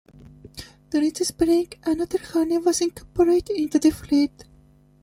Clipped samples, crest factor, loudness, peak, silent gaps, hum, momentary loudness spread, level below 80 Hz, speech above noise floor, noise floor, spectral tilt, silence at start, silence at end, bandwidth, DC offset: under 0.1%; 16 dB; -22 LUFS; -6 dBFS; none; 50 Hz at -55 dBFS; 7 LU; -50 dBFS; 33 dB; -54 dBFS; -4.5 dB/octave; 0.45 s; 0.6 s; 16 kHz; under 0.1%